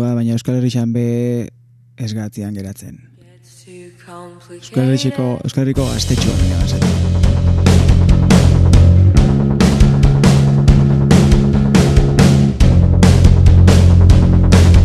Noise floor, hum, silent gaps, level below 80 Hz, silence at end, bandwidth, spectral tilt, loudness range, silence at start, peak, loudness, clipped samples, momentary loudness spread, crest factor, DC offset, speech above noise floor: -44 dBFS; none; none; -18 dBFS; 0 s; 12.5 kHz; -7 dB/octave; 13 LU; 0 s; 0 dBFS; -12 LUFS; 0.1%; 12 LU; 12 dB; under 0.1%; 27 dB